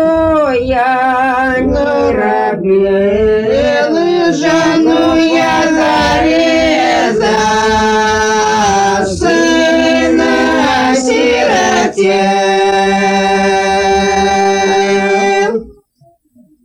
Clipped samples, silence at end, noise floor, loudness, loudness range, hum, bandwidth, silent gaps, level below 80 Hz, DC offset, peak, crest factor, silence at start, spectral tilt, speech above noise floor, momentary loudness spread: under 0.1%; 0.9 s; -50 dBFS; -10 LUFS; 1 LU; none; 11.5 kHz; none; -34 dBFS; under 0.1%; 0 dBFS; 10 dB; 0 s; -4 dB/octave; 40 dB; 2 LU